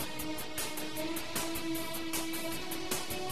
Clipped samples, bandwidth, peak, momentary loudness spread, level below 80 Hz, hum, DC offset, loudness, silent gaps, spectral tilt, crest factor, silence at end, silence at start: under 0.1%; 14 kHz; -18 dBFS; 3 LU; -56 dBFS; none; 1%; -36 LUFS; none; -2.5 dB/octave; 18 dB; 0 s; 0 s